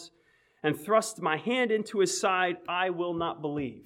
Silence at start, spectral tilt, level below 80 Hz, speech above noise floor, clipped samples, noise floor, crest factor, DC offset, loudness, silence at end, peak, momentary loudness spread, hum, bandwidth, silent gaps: 0 s; -3.5 dB/octave; -68 dBFS; 38 dB; under 0.1%; -66 dBFS; 18 dB; under 0.1%; -29 LUFS; 0.05 s; -12 dBFS; 6 LU; none; 16.5 kHz; none